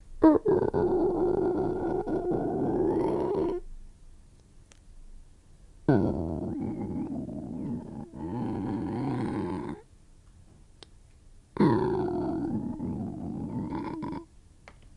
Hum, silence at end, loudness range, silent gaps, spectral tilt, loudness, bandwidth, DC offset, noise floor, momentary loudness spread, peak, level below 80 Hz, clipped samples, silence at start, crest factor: none; 0.05 s; 7 LU; none; -9.5 dB/octave; -29 LUFS; 11 kHz; under 0.1%; -55 dBFS; 12 LU; -6 dBFS; -48 dBFS; under 0.1%; 0.05 s; 24 dB